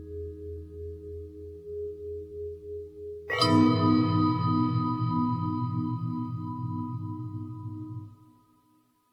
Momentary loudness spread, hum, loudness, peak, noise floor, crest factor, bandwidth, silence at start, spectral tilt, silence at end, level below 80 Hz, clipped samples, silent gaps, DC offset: 18 LU; none; -29 LUFS; -10 dBFS; -66 dBFS; 20 dB; 13.5 kHz; 0 s; -7.5 dB/octave; 0.95 s; -54 dBFS; under 0.1%; none; under 0.1%